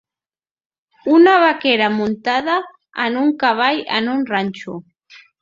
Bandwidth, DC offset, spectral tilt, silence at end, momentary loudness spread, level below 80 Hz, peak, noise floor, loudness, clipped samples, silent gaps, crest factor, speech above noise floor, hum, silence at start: 7.4 kHz; under 0.1%; -6 dB/octave; 0.25 s; 16 LU; -64 dBFS; -2 dBFS; under -90 dBFS; -16 LUFS; under 0.1%; none; 16 dB; over 74 dB; none; 1.05 s